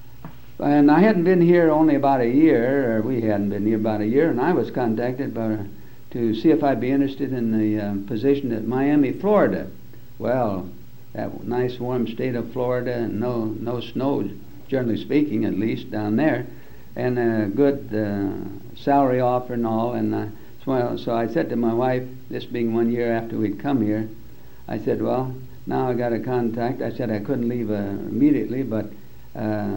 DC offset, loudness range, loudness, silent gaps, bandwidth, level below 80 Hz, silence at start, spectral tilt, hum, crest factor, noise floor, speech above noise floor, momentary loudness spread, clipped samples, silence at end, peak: 1%; 7 LU; -22 LUFS; none; 16 kHz; -52 dBFS; 0.2 s; -9 dB/octave; none; 18 dB; -42 dBFS; 21 dB; 13 LU; under 0.1%; 0 s; -4 dBFS